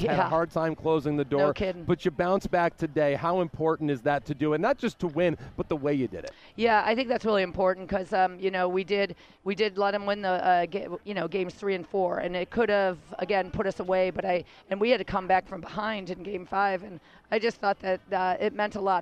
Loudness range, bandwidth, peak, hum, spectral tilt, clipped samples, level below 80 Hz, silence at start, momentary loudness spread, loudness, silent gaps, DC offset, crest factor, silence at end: 2 LU; 10 kHz; -10 dBFS; none; -6.5 dB/octave; under 0.1%; -54 dBFS; 0 s; 8 LU; -28 LUFS; none; under 0.1%; 16 dB; 0 s